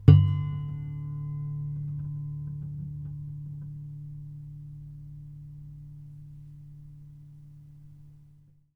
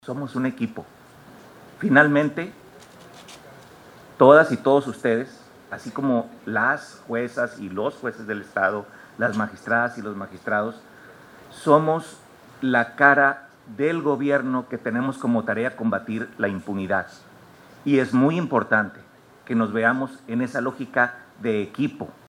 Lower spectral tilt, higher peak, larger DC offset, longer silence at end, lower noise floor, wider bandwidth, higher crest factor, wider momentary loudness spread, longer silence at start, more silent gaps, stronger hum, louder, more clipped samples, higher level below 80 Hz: first, -10.5 dB/octave vs -7 dB/octave; about the same, -2 dBFS vs -2 dBFS; neither; first, 0.5 s vs 0.2 s; first, -57 dBFS vs -48 dBFS; second, 5.2 kHz vs 13.5 kHz; first, 28 dB vs 22 dB; about the same, 16 LU vs 16 LU; about the same, 0 s vs 0.05 s; neither; neither; second, -31 LUFS vs -22 LUFS; neither; first, -50 dBFS vs -68 dBFS